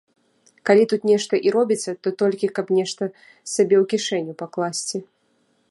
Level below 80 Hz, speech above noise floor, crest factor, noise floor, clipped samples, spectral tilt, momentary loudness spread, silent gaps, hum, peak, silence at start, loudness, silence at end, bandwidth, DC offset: -76 dBFS; 45 dB; 18 dB; -65 dBFS; under 0.1%; -4.5 dB/octave; 12 LU; none; none; -2 dBFS; 0.65 s; -21 LUFS; 0.7 s; 11.5 kHz; under 0.1%